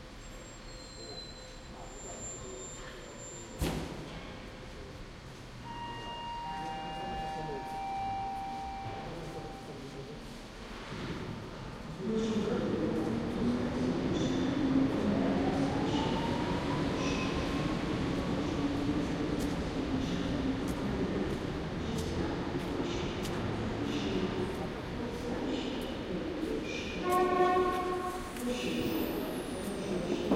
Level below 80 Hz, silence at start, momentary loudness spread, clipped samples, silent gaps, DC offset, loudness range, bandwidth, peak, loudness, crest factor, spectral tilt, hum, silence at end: -48 dBFS; 0 s; 14 LU; under 0.1%; none; under 0.1%; 10 LU; 16 kHz; -16 dBFS; -35 LUFS; 18 dB; -5.5 dB/octave; none; 0 s